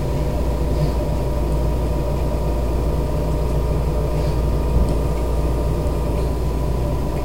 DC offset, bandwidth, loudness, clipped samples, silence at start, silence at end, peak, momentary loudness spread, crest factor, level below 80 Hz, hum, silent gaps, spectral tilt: 3%; 16 kHz; -22 LUFS; under 0.1%; 0 s; 0 s; -6 dBFS; 2 LU; 12 dB; -22 dBFS; none; none; -7.5 dB/octave